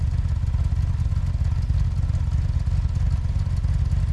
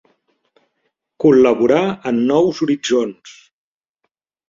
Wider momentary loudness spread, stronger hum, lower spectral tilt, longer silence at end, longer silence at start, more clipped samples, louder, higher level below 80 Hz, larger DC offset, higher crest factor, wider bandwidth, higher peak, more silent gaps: second, 1 LU vs 7 LU; neither; first, -8 dB/octave vs -6 dB/octave; second, 0 s vs 1.2 s; second, 0 s vs 1.2 s; neither; second, -24 LUFS vs -15 LUFS; first, -24 dBFS vs -60 dBFS; neither; second, 10 dB vs 16 dB; first, 9 kHz vs 7.6 kHz; second, -12 dBFS vs -2 dBFS; neither